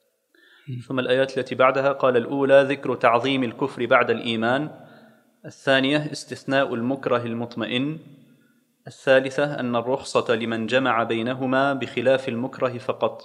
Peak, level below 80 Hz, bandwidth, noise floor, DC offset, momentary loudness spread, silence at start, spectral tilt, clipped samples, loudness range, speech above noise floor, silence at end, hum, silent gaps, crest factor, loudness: -2 dBFS; -72 dBFS; 11 kHz; -62 dBFS; under 0.1%; 10 LU; 0.65 s; -5.5 dB/octave; under 0.1%; 5 LU; 40 dB; 0 s; none; none; 22 dB; -22 LUFS